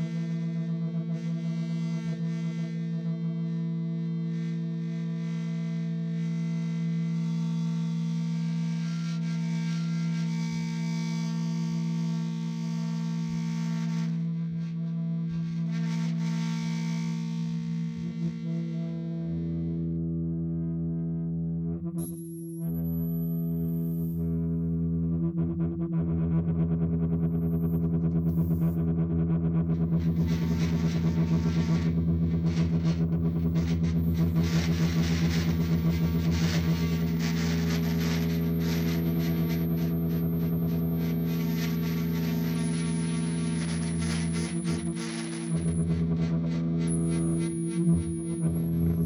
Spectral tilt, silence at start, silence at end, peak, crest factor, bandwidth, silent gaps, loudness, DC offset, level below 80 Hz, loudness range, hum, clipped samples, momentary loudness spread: -7 dB/octave; 0 s; 0 s; -16 dBFS; 12 dB; 15.5 kHz; none; -29 LUFS; under 0.1%; -44 dBFS; 5 LU; none; under 0.1%; 5 LU